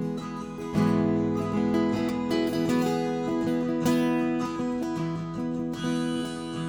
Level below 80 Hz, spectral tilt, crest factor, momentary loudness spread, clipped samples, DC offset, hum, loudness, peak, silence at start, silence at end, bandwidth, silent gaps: -54 dBFS; -6.5 dB/octave; 14 dB; 7 LU; under 0.1%; under 0.1%; none; -27 LUFS; -12 dBFS; 0 s; 0 s; over 20 kHz; none